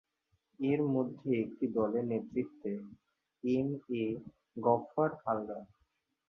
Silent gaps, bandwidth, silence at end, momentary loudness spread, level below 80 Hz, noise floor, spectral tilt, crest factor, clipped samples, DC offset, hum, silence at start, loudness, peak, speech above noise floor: none; 6.2 kHz; 0.65 s; 13 LU; -72 dBFS; -79 dBFS; -9.5 dB/octave; 20 dB; under 0.1%; under 0.1%; none; 0.6 s; -35 LUFS; -14 dBFS; 45 dB